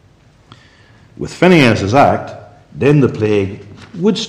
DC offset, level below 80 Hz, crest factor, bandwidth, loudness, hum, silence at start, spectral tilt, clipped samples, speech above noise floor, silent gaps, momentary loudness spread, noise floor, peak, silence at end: under 0.1%; -48 dBFS; 14 dB; 13 kHz; -13 LUFS; none; 1.2 s; -6.5 dB/octave; under 0.1%; 35 dB; none; 20 LU; -48 dBFS; 0 dBFS; 0 s